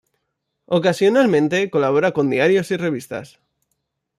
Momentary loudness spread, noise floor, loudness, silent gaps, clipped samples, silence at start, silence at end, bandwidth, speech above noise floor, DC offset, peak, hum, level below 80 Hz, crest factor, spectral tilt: 10 LU; -75 dBFS; -18 LUFS; none; under 0.1%; 0.7 s; 0.95 s; 13.5 kHz; 58 dB; under 0.1%; -4 dBFS; none; -64 dBFS; 16 dB; -6 dB/octave